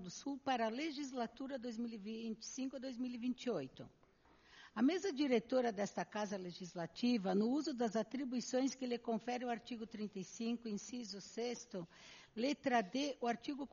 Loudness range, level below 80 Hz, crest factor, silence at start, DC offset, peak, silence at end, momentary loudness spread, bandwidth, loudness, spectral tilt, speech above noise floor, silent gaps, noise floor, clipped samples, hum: 6 LU; -78 dBFS; 18 dB; 0 s; under 0.1%; -22 dBFS; 0.05 s; 11 LU; 7.2 kHz; -41 LUFS; -4 dB/octave; 28 dB; none; -69 dBFS; under 0.1%; none